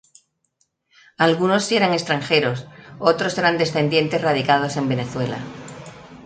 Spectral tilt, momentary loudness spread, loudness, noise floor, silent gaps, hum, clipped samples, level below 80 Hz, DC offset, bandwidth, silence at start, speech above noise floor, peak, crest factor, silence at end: -5 dB/octave; 17 LU; -20 LUFS; -69 dBFS; none; none; under 0.1%; -58 dBFS; under 0.1%; 9.4 kHz; 1.2 s; 49 dB; 0 dBFS; 20 dB; 0 s